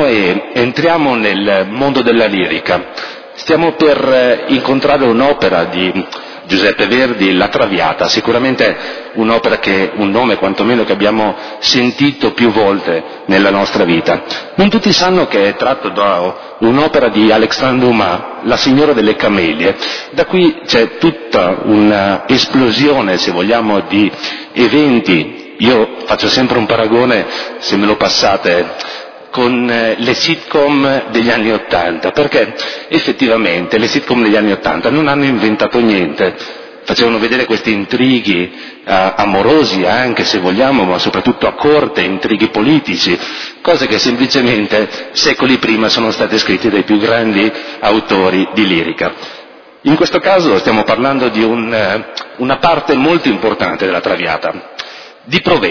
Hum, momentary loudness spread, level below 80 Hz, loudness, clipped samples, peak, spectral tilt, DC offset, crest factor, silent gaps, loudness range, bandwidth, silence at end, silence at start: none; 7 LU; -44 dBFS; -11 LUFS; under 0.1%; 0 dBFS; -5 dB/octave; under 0.1%; 12 dB; none; 2 LU; 5.4 kHz; 0 s; 0 s